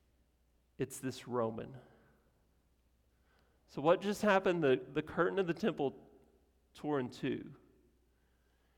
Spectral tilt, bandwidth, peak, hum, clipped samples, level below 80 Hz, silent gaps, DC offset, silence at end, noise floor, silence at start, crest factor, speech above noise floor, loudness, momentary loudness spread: -6 dB/octave; 17 kHz; -16 dBFS; none; under 0.1%; -70 dBFS; none; under 0.1%; 1.25 s; -74 dBFS; 0.8 s; 22 dB; 39 dB; -35 LUFS; 14 LU